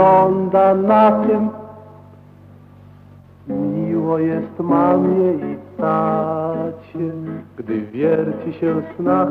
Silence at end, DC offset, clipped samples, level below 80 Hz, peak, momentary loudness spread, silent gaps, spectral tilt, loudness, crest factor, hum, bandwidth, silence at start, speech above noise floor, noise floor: 0 s; under 0.1%; under 0.1%; -58 dBFS; -2 dBFS; 14 LU; none; -10.5 dB/octave; -18 LUFS; 16 dB; none; 5 kHz; 0 s; 27 dB; -43 dBFS